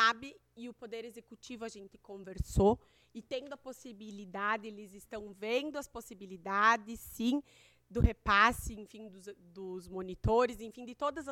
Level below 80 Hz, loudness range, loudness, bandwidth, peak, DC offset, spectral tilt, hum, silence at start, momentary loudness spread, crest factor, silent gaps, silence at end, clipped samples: -46 dBFS; 7 LU; -33 LUFS; 18 kHz; -12 dBFS; under 0.1%; -5 dB/octave; none; 0 s; 22 LU; 22 dB; none; 0 s; under 0.1%